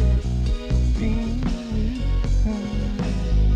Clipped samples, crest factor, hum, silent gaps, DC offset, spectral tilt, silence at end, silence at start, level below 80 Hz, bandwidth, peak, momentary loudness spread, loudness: under 0.1%; 12 dB; none; none; under 0.1%; -7.5 dB/octave; 0 s; 0 s; -22 dBFS; 8.4 kHz; -10 dBFS; 4 LU; -24 LUFS